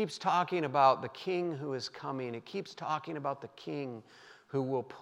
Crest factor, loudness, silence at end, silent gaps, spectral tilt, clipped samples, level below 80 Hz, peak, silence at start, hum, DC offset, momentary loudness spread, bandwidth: 22 dB; -34 LUFS; 0 s; none; -6 dB/octave; under 0.1%; -86 dBFS; -12 dBFS; 0 s; none; under 0.1%; 14 LU; 12 kHz